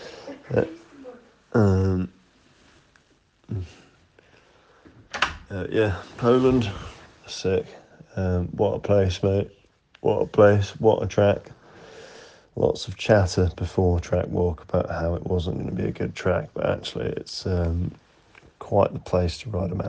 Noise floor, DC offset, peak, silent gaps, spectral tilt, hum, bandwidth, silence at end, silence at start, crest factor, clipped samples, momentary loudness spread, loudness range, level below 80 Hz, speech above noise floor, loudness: -62 dBFS; under 0.1%; -2 dBFS; none; -7 dB/octave; none; 8.8 kHz; 0 s; 0 s; 22 dB; under 0.1%; 17 LU; 7 LU; -48 dBFS; 39 dB; -24 LUFS